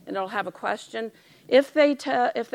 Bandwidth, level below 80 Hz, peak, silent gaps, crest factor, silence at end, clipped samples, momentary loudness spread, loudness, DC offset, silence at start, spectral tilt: 14.5 kHz; -80 dBFS; -6 dBFS; none; 20 dB; 0.1 s; under 0.1%; 13 LU; -24 LUFS; under 0.1%; 0.05 s; -4 dB/octave